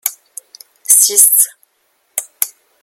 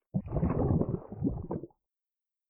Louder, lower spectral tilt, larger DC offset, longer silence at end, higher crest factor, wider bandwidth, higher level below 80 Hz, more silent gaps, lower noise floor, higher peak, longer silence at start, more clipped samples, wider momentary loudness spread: first, -10 LUFS vs -33 LUFS; second, 3.5 dB/octave vs -14.5 dB/octave; neither; second, 0.35 s vs 0.85 s; about the same, 16 dB vs 18 dB; first, over 20 kHz vs 2.8 kHz; second, -70 dBFS vs -44 dBFS; neither; second, -62 dBFS vs under -90 dBFS; first, 0 dBFS vs -14 dBFS; about the same, 0.05 s vs 0.15 s; first, 0.4% vs under 0.1%; first, 17 LU vs 11 LU